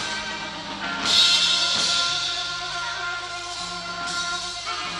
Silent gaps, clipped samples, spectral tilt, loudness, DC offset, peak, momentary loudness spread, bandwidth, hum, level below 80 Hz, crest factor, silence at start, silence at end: none; under 0.1%; 0 dB/octave; -22 LUFS; under 0.1%; -6 dBFS; 14 LU; 13 kHz; none; -54 dBFS; 18 dB; 0 s; 0 s